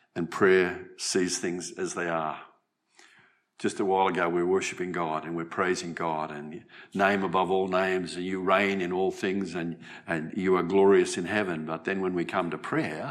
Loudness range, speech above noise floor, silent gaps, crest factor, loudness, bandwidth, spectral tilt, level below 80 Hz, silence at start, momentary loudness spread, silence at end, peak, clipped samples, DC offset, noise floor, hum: 4 LU; 39 dB; none; 18 dB; -28 LUFS; 12.5 kHz; -4.5 dB/octave; -74 dBFS; 0.15 s; 11 LU; 0 s; -10 dBFS; under 0.1%; under 0.1%; -66 dBFS; none